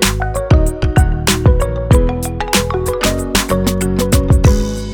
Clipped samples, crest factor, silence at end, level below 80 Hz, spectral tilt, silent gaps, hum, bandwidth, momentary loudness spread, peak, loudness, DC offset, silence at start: under 0.1%; 12 dB; 0 s; -18 dBFS; -5 dB/octave; none; none; over 20 kHz; 5 LU; 0 dBFS; -14 LUFS; under 0.1%; 0 s